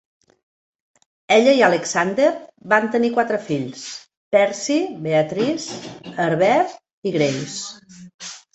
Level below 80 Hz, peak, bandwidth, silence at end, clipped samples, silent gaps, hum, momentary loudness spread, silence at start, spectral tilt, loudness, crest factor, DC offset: -64 dBFS; -2 dBFS; 8.2 kHz; 0.15 s; under 0.1%; 4.17-4.31 s, 6.93-7.02 s, 8.14-8.19 s; none; 17 LU; 1.3 s; -4.5 dB/octave; -19 LUFS; 18 dB; under 0.1%